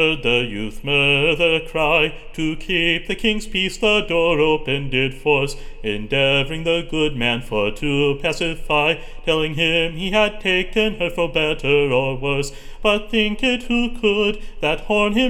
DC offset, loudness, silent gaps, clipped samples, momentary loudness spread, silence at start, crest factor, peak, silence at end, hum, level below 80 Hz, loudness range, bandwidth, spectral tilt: under 0.1%; -19 LUFS; none; under 0.1%; 6 LU; 0 s; 16 dB; -2 dBFS; 0 s; none; -32 dBFS; 2 LU; 15 kHz; -5 dB/octave